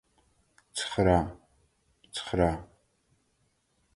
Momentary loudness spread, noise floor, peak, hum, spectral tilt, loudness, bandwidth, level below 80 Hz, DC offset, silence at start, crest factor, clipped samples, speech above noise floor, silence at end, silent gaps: 15 LU; -73 dBFS; -10 dBFS; none; -5.5 dB/octave; -29 LUFS; 11.5 kHz; -46 dBFS; under 0.1%; 0.75 s; 24 dB; under 0.1%; 46 dB; 1.3 s; none